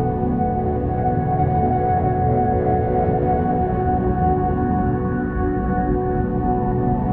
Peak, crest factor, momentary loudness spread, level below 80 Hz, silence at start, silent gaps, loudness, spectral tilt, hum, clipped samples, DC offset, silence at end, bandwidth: -6 dBFS; 12 dB; 3 LU; -30 dBFS; 0 s; none; -20 LUFS; -13 dB/octave; none; under 0.1%; under 0.1%; 0 s; 3.7 kHz